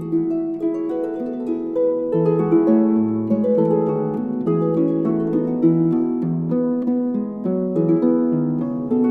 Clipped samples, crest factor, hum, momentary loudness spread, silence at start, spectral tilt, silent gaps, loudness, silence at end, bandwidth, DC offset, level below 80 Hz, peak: under 0.1%; 14 dB; none; 7 LU; 0 s; -12 dB/octave; none; -20 LUFS; 0 s; 3.2 kHz; under 0.1%; -58 dBFS; -6 dBFS